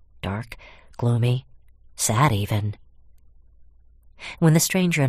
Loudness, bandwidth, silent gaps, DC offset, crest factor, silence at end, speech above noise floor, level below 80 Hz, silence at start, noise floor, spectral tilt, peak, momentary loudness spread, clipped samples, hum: -22 LUFS; 15.5 kHz; none; under 0.1%; 20 dB; 0 s; 30 dB; -50 dBFS; 0.25 s; -51 dBFS; -5 dB/octave; -4 dBFS; 21 LU; under 0.1%; none